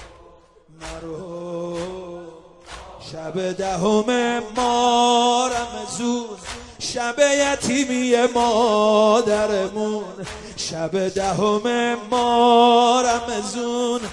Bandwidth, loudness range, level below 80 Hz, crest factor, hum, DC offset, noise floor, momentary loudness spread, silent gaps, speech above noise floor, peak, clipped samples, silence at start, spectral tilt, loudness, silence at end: 11.5 kHz; 8 LU; -50 dBFS; 18 dB; none; under 0.1%; -50 dBFS; 18 LU; none; 31 dB; -4 dBFS; under 0.1%; 0 s; -3.5 dB/octave; -19 LUFS; 0 s